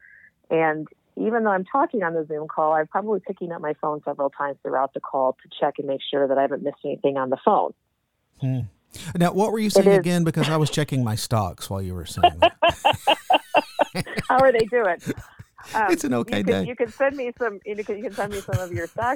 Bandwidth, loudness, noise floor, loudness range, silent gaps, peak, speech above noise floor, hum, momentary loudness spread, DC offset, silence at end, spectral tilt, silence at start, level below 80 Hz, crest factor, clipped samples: 19 kHz; -23 LUFS; -73 dBFS; 5 LU; none; -4 dBFS; 50 dB; none; 12 LU; under 0.1%; 0 s; -5.5 dB/octave; 0.5 s; -52 dBFS; 20 dB; under 0.1%